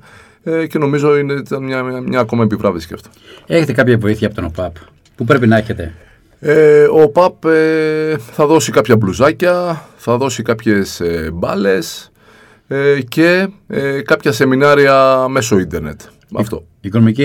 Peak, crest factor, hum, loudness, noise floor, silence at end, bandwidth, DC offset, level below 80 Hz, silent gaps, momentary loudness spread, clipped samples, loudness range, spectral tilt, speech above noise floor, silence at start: 0 dBFS; 14 dB; none; -13 LUFS; -45 dBFS; 0 s; 17 kHz; under 0.1%; -42 dBFS; none; 14 LU; 0.1%; 5 LU; -6 dB/octave; 32 dB; 0.45 s